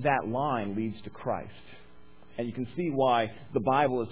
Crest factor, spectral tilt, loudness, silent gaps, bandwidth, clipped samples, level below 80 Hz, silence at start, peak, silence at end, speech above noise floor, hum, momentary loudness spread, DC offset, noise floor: 18 dB; -10 dB/octave; -30 LUFS; none; 4 kHz; under 0.1%; -60 dBFS; 0 s; -12 dBFS; 0 s; 27 dB; none; 12 LU; 0.4%; -56 dBFS